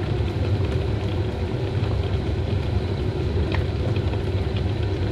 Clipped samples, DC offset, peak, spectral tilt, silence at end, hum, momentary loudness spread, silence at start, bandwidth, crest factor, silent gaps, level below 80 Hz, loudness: under 0.1%; under 0.1%; -10 dBFS; -8 dB/octave; 0 s; none; 2 LU; 0 s; 8.4 kHz; 12 dB; none; -32 dBFS; -25 LUFS